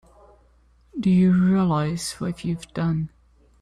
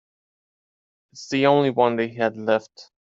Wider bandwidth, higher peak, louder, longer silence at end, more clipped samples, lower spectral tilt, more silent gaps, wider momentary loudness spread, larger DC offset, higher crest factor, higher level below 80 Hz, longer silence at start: first, 12.5 kHz vs 7.8 kHz; second, -10 dBFS vs -4 dBFS; about the same, -22 LUFS vs -21 LUFS; first, 0.55 s vs 0.2 s; neither; about the same, -7 dB/octave vs -6 dB/octave; neither; first, 12 LU vs 8 LU; neither; second, 12 dB vs 20 dB; first, -50 dBFS vs -66 dBFS; second, 0.95 s vs 1.15 s